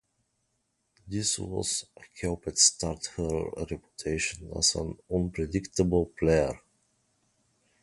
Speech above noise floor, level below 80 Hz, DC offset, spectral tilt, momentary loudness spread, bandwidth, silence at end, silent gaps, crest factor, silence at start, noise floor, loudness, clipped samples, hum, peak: 48 dB; -46 dBFS; under 0.1%; -3.5 dB/octave; 14 LU; 11.5 kHz; 1.25 s; none; 24 dB; 1.05 s; -77 dBFS; -28 LUFS; under 0.1%; none; -8 dBFS